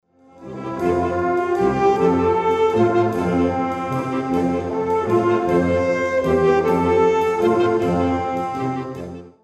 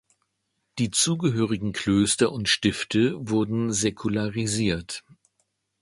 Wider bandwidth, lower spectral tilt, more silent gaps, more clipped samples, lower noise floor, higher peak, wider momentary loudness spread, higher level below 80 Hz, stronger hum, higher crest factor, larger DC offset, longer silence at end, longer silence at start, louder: about the same, 12 kHz vs 11.5 kHz; first, -7.5 dB/octave vs -4 dB/octave; neither; neither; second, -40 dBFS vs -76 dBFS; about the same, -4 dBFS vs -6 dBFS; about the same, 7 LU vs 7 LU; first, -46 dBFS vs -52 dBFS; neither; about the same, 14 dB vs 18 dB; neither; second, 0.15 s vs 0.85 s; second, 0.4 s vs 0.75 s; first, -19 LUFS vs -24 LUFS